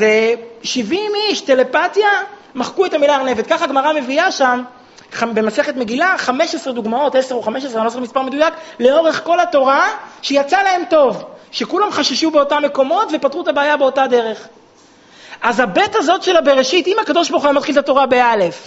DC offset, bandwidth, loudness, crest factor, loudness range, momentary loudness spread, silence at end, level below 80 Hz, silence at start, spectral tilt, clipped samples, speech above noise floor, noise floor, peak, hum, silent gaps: under 0.1%; 8 kHz; -15 LUFS; 16 dB; 3 LU; 8 LU; 0 s; -58 dBFS; 0 s; -1 dB/octave; under 0.1%; 32 dB; -47 dBFS; 0 dBFS; none; none